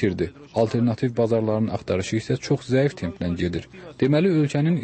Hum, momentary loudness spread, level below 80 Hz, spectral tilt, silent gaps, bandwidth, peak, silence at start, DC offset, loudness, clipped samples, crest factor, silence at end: none; 8 LU; -50 dBFS; -7 dB/octave; none; 8.8 kHz; -8 dBFS; 0 s; under 0.1%; -23 LUFS; under 0.1%; 14 dB; 0 s